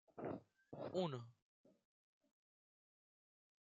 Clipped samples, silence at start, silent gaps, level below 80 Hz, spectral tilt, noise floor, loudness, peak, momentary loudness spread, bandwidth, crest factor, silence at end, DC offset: under 0.1%; 0.15 s; 1.42-1.64 s; under -90 dBFS; -6 dB/octave; under -90 dBFS; -48 LUFS; -30 dBFS; 15 LU; 7.4 kHz; 22 dB; 2.05 s; under 0.1%